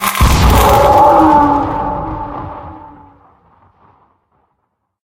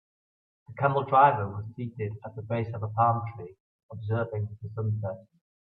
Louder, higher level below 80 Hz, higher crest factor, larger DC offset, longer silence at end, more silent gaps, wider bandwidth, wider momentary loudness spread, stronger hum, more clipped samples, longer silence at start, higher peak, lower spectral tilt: first, -10 LUFS vs -28 LUFS; first, -20 dBFS vs -68 dBFS; second, 12 dB vs 22 dB; neither; first, 2.15 s vs 0.45 s; second, none vs 3.60-3.89 s; first, 17.5 kHz vs 4.1 kHz; about the same, 20 LU vs 21 LU; neither; neither; second, 0 s vs 0.7 s; first, 0 dBFS vs -8 dBFS; second, -5.5 dB/octave vs -10.5 dB/octave